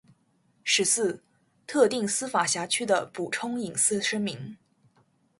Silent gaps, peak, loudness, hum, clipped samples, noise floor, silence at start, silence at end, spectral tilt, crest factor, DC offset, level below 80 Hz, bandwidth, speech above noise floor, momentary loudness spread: none; -8 dBFS; -26 LUFS; none; under 0.1%; -67 dBFS; 0.65 s; 0.85 s; -2 dB/octave; 20 dB; under 0.1%; -72 dBFS; 12 kHz; 41 dB; 10 LU